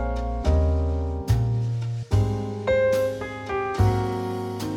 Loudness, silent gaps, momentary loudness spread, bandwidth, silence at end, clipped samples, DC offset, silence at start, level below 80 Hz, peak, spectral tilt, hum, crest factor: -25 LUFS; none; 7 LU; 16 kHz; 0 s; under 0.1%; under 0.1%; 0 s; -30 dBFS; -8 dBFS; -7.5 dB/octave; none; 16 dB